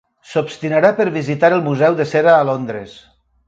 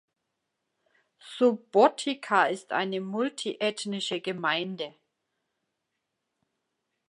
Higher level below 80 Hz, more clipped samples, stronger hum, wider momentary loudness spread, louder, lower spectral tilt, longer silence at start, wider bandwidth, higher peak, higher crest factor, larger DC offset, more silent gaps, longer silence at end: first, -60 dBFS vs -86 dBFS; neither; neither; about the same, 10 LU vs 11 LU; first, -15 LUFS vs -27 LUFS; first, -7 dB/octave vs -4 dB/octave; second, 0.3 s vs 1.25 s; second, 7.8 kHz vs 11.5 kHz; first, 0 dBFS vs -6 dBFS; second, 16 dB vs 24 dB; neither; neither; second, 0.5 s vs 2.2 s